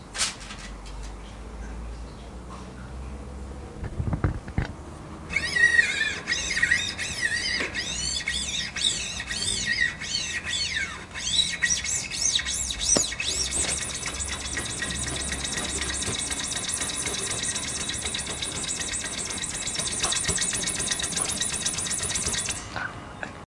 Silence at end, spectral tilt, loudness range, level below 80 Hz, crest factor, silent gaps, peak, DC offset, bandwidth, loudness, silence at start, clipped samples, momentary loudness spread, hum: 0.05 s; -1 dB/octave; 11 LU; -42 dBFS; 22 dB; none; -6 dBFS; under 0.1%; 12 kHz; -25 LUFS; 0 s; under 0.1%; 17 LU; none